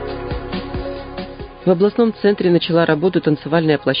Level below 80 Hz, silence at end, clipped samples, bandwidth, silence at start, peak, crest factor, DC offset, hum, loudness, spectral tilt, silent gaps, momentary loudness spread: -38 dBFS; 0 s; under 0.1%; 5.2 kHz; 0 s; -2 dBFS; 16 dB; under 0.1%; none; -17 LUFS; -12 dB/octave; none; 13 LU